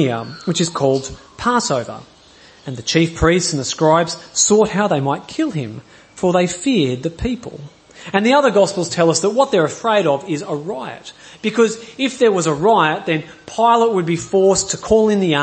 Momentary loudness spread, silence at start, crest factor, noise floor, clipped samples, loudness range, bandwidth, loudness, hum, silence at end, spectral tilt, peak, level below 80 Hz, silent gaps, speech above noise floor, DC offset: 14 LU; 0 s; 16 dB; -46 dBFS; under 0.1%; 3 LU; 8.8 kHz; -17 LUFS; none; 0 s; -4.5 dB/octave; 0 dBFS; -42 dBFS; none; 29 dB; under 0.1%